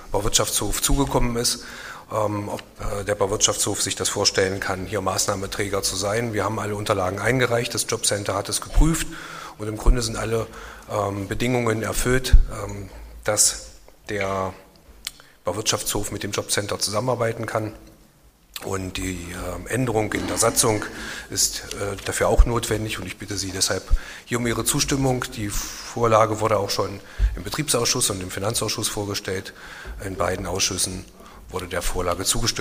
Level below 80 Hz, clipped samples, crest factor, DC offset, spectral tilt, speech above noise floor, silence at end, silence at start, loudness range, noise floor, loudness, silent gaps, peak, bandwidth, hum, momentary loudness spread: -30 dBFS; under 0.1%; 22 dB; under 0.1%; -3 dB/octave; 31 dB; 0 s; 0 s; 4 LU; -54 dBFS; -23 LUFS; none; 0 dBFS; 15.5 kHz; none; 13 LU